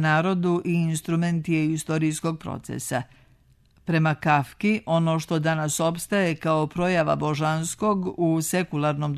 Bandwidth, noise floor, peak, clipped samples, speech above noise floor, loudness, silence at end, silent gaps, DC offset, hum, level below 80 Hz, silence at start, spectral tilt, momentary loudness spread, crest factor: 13.5 kHz; -58 dBFS; -8 dBFS; under 0.1%; 35 dB; -24 LUFS; 0 s; none; under 0.1%; none; -56 dBFS; 0 s; -5.5 dB/octave; 7 LU; 16 dB